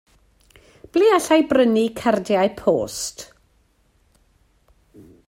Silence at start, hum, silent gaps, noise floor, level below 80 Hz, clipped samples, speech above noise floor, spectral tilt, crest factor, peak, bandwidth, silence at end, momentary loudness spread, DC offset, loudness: 0.95 s; none; none; -61 dBFS; -56 dBFS; under 0.1%; 43 dB; -4.5 dB/octave; 18 dB; -4 dBFS; 16 kHz; 2.05 s; 12 LU; under 0.1%; -19 LUFS